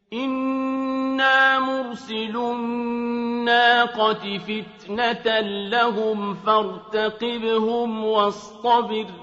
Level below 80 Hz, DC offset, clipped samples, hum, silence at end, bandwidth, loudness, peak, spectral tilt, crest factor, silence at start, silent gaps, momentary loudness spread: -64 dBFS; under 0.1%; under 0.1%; none; 0 s; 8 kHz; -22 LUFS; -4 dBFS; -5 dB/octave; 18 dB; 0.1 s; none; 11 LU